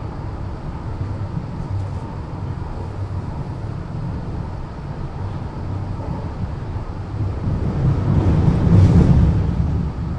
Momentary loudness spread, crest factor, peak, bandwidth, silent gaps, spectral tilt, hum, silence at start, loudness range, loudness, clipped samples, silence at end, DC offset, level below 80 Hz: 15 LU; 18 dB; -2 dBFS; 8 kHz; none; -9.5 dB/octave; none; 0 s; 11 LU; -21 LUFS; under 0.1%; 0 s; under 0.1%; -28 dBFS